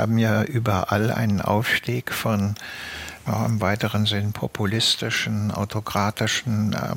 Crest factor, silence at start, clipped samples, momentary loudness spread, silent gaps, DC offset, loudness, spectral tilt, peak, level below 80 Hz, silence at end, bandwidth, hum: 18 dB; 0 s; under 0.1%; 7 LU; none; under 0.1%; -23 LUFS; -5 dB/octave; -6 dBFS; -52 dBFS; 0 s; 17 kHz; none